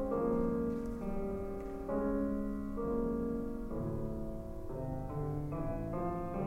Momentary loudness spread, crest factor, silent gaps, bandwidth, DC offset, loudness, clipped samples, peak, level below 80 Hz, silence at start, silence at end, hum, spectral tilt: 8 LU; 14 dB; none; 16 kHz; under 0.1%; -38 LUFS; under 0.1%; -22 dBFS; -46 dBFS; 0 s; 0 s; none; -10 dB/octave